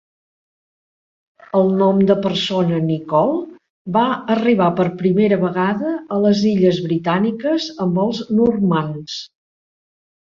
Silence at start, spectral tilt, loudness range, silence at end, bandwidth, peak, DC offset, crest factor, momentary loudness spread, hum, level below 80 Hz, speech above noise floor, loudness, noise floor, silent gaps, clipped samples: 1.55 s; -7 dB/octave; 2 LU; 1 s; 7.4 kHz; -2 dBFS; under 0.1%; 16 dB; 7 LU; none; -58 dBFS; over 73 dB; -17 LUFS; under -90 dBFS; 3.70-3.85 s; under 0.1%